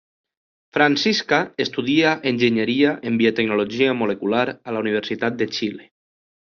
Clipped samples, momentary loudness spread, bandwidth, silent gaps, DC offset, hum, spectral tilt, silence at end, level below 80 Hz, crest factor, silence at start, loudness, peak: under 0.1%; 7 LU; 7 kHz; none; under 0.1%; none; -3 dB/octave; 0.75 s; -62 dBFS; 20 dB; 0.75 s; -20 LUFS; -2 dBFS